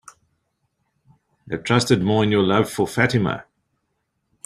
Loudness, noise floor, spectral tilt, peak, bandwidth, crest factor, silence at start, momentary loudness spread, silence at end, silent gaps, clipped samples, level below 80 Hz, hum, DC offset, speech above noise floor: -19 LUFS; -74 dBFS; -5.5 dB/octave; -2 dBFS; 15 kHz; 20 dB; 1.45 s; 12 LU; 1.05 s; none; under 0.1%; -54 dBFS; none; under 0.1%; 55 dB